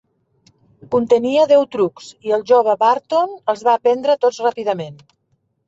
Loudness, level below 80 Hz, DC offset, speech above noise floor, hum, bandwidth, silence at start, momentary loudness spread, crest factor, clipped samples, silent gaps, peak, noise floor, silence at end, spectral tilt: -17 LUFS; -64 dBFS; under 0.1%; 50 dB; none; 8 kHz; 0.9 s; 9 LU; 14 dB; under 0.1%; none; -2 dBFS; -66 dBFS; 0.75 s; -5.5 dB/octave